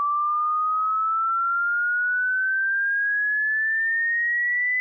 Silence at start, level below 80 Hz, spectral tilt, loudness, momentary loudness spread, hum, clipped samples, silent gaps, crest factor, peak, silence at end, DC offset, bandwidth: 0 s; under -90 dBFS; 2.5 dB/octave; -22 LUFS; 2 LU; none; under 0.1%; none; 4 dB; -20 dBFS; 0 s; under 0.1%; 2.2 kHz